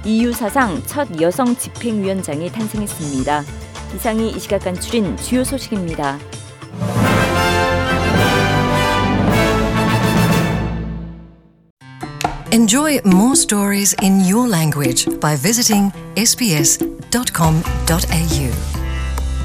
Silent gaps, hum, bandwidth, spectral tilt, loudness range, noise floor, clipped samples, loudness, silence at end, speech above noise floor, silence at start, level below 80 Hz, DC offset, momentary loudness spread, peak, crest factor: 11.70-11.77 s; none; 18 kHz; -4.5 dB/octave; 7 LU; -43 dBFS; under 0.1%; -16 LUFS; 0 s; 26 dB; 0 s; -30 dBFS; under 0.1%; 10 LU; -2 dBFS; 14 dB